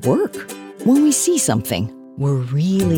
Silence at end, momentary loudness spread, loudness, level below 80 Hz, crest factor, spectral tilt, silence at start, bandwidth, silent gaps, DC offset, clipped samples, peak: 0 s; 13 LU; -18 LUFS; -50 dBFS; 14 dB; -5.5 dB/octave; 0 s; 19.5 kHz; none; under 0.1%; under 0.1%; -4 dBFS